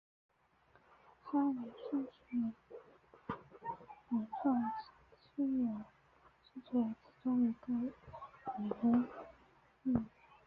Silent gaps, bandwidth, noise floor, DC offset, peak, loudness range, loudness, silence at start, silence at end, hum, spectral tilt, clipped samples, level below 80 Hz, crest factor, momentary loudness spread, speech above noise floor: none; 4.9 kHz; -70 dBFS; under 0.1%; -20 dBFS; 4 LU; -39 LUFS; 1.25 s; 0.4 s; none; -7.5 dB/octave; under 0.1%; -70 dBFS; 20 dB; 20 LU; 34 dB